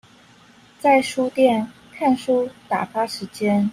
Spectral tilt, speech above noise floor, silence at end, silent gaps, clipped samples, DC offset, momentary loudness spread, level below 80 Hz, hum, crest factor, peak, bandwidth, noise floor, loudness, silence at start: -5.5 dB/octave; 31 dB; 0 s; none; under 0.1%; under 0.1%; 8 LU; -64 dBFS; none; 18 dB; -4 dBFS; 15.5 kHz; -50 dBFS; -21 LUFS; 0.85 s